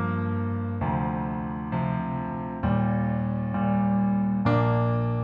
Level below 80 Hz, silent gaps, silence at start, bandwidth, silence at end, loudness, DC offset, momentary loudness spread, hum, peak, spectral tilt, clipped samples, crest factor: -44 dBFS; none; 0 s; 5.2 kHz; 0 s; -26 LUFS; under 0.1%; 7 LU; none; -10 dBFS; -11 dB/octave; under 0.1%; 14 dB